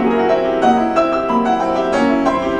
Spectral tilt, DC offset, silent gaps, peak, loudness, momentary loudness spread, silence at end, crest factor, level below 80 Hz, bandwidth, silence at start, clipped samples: -6 dB/octave; under 0.1%; none; -2 dBFS; -15 LUFS; 2 LU; 0 s; 14 dB; -42 dBFS; 10 kHz; 0 s; under 0.1%